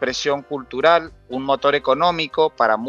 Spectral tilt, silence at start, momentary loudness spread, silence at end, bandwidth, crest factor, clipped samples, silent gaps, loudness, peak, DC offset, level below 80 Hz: -4 dB/octave; 0 s; 10 LU; 0 s; 7.8 kHz; 18 dB; under 0.1%; none; -19 LUFS; -2 dBFS; under 0.1%; -52 dBFS